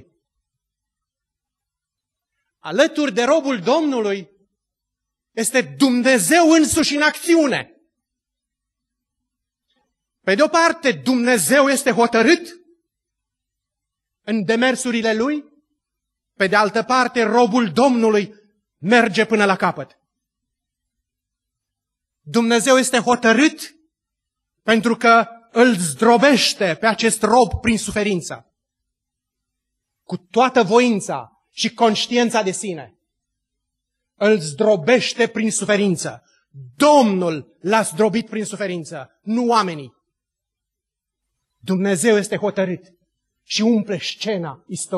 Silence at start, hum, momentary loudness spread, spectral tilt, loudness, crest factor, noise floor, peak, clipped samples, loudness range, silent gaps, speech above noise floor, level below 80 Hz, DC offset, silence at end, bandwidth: 2.65 s; none; 14 LU; -4 dB/octave; -17 LUFS; 18 dB; -84 dBFS; -2 dBFS; under 0.1%; 6 LU; none; 67 dB; -52 dBFS; under 0.1%; 0 s; 12.5 kHz